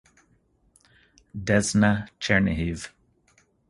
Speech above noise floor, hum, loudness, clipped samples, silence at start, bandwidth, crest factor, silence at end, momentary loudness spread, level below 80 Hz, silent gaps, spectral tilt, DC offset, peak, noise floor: 41 dB; none; -24 LUFS; under 0.1%; 1.35 s; 11.5 kHz; 22 dB; 0.8 s; 17 LU; -44 dBFS; none; -5 dB/octave; under 0.1%; -6 dBFS; -65 dBFS